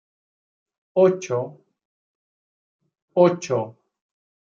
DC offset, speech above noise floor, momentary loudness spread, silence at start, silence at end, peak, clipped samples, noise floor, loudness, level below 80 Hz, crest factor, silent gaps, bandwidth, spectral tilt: under 0.1%; over 70 dB; 11 LU; 0.95 s; 0.8 s; -4 dBFS; under 0.1%; under -90 dBFS; -21 LUFS; -76 dBFS; 22 dB; 1.85-2.79 s, 3.02-3.08 s; 7.6 kHz; -6.5 dB/octave